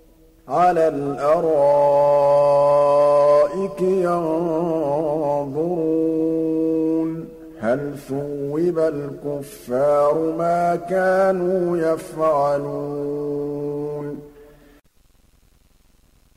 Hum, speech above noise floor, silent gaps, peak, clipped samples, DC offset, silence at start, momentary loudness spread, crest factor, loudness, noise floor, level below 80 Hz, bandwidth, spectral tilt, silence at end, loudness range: none; 37 dB; none; -8 dBFS; under 0.1%; under 0.1%; 0.45 s; 12 LU; 12 dB; -20 LUFS; -56 dBFS; -54 dBFS; 14 kHz; -7.5 dB/octave; 1.95 s; 8 LU